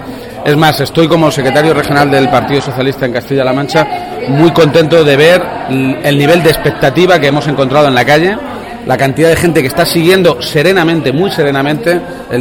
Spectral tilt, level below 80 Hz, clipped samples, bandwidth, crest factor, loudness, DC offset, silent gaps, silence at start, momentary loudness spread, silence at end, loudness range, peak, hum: -5.5 dB/octave; -38 dBFS; 0.5%; 18 kHz; 10 dB; -9 LUFS; under 0.1%; none; 0 s; 8 LU; 0 s; 2 LU; 0 dBFS; none